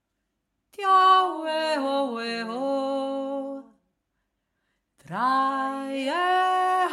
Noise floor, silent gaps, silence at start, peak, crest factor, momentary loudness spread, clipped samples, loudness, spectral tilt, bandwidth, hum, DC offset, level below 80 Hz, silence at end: -79 dBFS; none; 0.8 s; -8 dBFS; 18 dB; 12 LU; under 0.1%; -24 LUFS; -3.5 dB/octave; 13.5 kHz; none; under 0.1%; -80 dBFS; 0 s